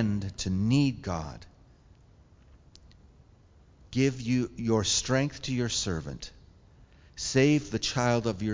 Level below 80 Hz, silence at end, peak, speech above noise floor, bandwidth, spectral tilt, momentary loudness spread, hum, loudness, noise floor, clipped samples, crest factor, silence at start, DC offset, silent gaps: -50 dBFS; 0 s; -10 dBFS; 30 dB; 7.6 kHz; -5 dB/octave; 14 LU; none; -28 LUFS; -58 dBFS; under 0.1%; 20 dB; 0 s; under 0.1%; none